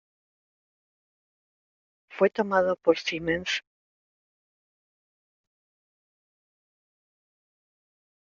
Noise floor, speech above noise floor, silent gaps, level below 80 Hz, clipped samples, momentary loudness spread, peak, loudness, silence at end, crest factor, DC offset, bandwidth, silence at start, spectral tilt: under -90 dBFS; over 65 dB; none; -66 dBFS; under 0.1%; 7 LU; -8 dBFS; -26 LUFS; 4.65 s; 24 dB; under 0.1%; 7.4 kHz; 2.1 s; -2.5 dB/octave